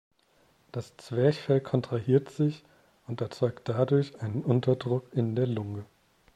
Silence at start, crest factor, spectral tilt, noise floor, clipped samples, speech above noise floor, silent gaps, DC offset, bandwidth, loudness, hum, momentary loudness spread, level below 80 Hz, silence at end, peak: 0.75 s; 20 dB; -8.5 dB/octave; -66 dBFS; under 0.1%; 38 dB; none; under 0.1%; 9.8 kHz; -29 LUFS; none; 14 LU; -66 dBFS; 0.5 s; -10 dBFS